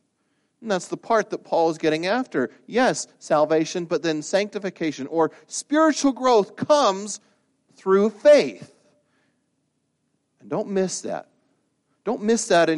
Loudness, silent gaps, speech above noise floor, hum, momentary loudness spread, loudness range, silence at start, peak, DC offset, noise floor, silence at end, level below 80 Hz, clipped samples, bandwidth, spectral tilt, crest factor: -22 LUFS; none; 51 dB; none; 12 LU; 9 LU; 0.6 s; -4 dBFS; under 0.1%; -72 dBFS; 0 s; -70 dBFS; under 0.1%; 11.5 kHz; -4 dB/octave; 18 dB